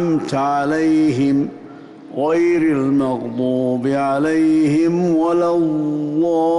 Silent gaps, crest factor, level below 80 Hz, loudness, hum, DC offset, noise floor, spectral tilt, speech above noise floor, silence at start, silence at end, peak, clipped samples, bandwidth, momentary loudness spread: none; 8 dB; -56 dBFS; -17 LUFS; none; under 0.1%; -37 dBFS; -7.5 dB/octave; 21 dB; 0 s; 0 s; -8 dBFS; under 0.1%; 11 kHz; 5 LU